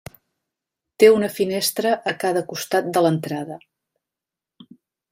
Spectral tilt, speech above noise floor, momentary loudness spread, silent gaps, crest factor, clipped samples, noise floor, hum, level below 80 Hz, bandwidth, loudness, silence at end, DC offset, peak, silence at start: -4.5 dB/octave; 68 dB; 14 LU; none; 20 dB; under 0.1%; -88 dBFS; none; -64 dBFS; 16 kHz; -20 LUFS; 1.55 s; under 0.1%; -2 dBFS; 1 s